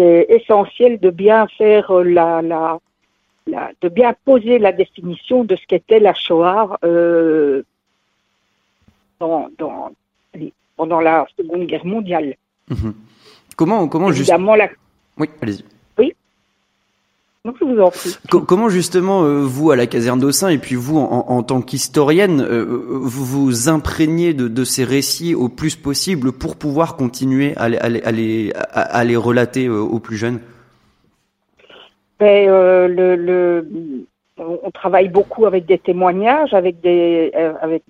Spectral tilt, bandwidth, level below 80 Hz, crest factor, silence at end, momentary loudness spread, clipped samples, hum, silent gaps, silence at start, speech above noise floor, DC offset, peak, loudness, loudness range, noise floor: -5.5 dB/octave; 16 kHz; -46 dBFS; 16 dB; 0.1 s; 13 LU; under 0.1%; none; none; 0 s; 52 dB; under 0.1%; 0 dBFS; -15 LUFS; 6 LU; -66 dBFS